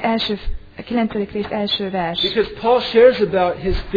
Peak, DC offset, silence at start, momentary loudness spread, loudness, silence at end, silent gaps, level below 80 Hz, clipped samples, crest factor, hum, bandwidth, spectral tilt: 0 dBFS; under 0.1%; 0 s; 11 LU; -18 LUFS; 0 s; none; -32 dBFS; under 0.1%; 18 dB; none; 5 kHz; -7 dB/octave